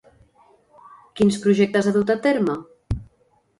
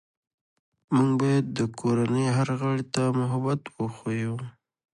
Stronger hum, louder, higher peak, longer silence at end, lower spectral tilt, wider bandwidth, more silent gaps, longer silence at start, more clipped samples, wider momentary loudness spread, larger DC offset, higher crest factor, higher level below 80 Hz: neither; first, -21 LUFS vs -26 LUFS; first, -6 dBFS vs -10 dBFS; about the same, 0.55 s vs 0.45 s; about the same, -6.5 dB/octave vs -7 dB/octave; about the same, 11.5 kHz vs 11 kHz; neither; first, 1.15 s vs 0.9 s; neither; first, 13 LU vs 9 LU; neither; about the same, 16 dB vs 16 dB; first, -42 dBFS vs -64 dBFS